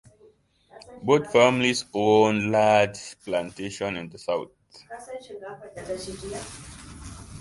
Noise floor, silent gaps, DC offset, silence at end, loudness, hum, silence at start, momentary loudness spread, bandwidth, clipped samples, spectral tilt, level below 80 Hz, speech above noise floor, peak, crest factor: -58 dBFS; none; under 0.1%; 0 s; -23 LUFS; none; 0.8 s; 22 LU; 11.5 kHz; under 0.1%; -4.5 dB/octave; -54 dBFS; 34 dB; -4 dBFS; 22 dB